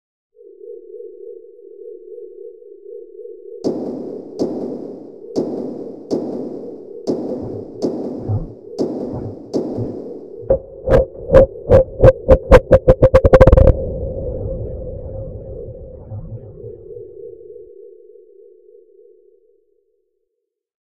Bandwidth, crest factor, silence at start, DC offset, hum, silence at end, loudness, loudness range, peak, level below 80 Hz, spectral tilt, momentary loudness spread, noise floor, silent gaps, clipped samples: 8.2 kHz; 18 dB; 0.65 s; 0.3%; none; 3.05 s; -16 LUFS; 23 LU; 0 dBFS; -26 dBFS; -8.5 dB/octave; 25 LU; -76 dBFS; none; 0.3%